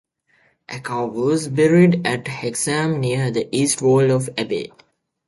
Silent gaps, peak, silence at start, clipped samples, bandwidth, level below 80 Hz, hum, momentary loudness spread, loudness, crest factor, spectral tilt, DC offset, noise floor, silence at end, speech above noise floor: none; -4 dBFS; 0.7 s; under 0.1%; 12 kHz; -58 dBFS; none; 12 LU; -19 LUFS; 16 dB; -5.5 dB/octave; under 0.1%; -61 dBFS; 0.6 s; 42 dB